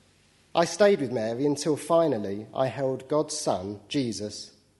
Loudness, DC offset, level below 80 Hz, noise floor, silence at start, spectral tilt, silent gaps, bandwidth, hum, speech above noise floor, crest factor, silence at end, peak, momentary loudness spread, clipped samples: -27 LUFS; under 0.1%; -68 dBFS; -61 dBFS; 0.55 s; -5 dB/octave; none; 11.5 kHz; none; 35 dB; 20 dB; 0.3 s; -6 dBFS; 10 LU; under 0.1%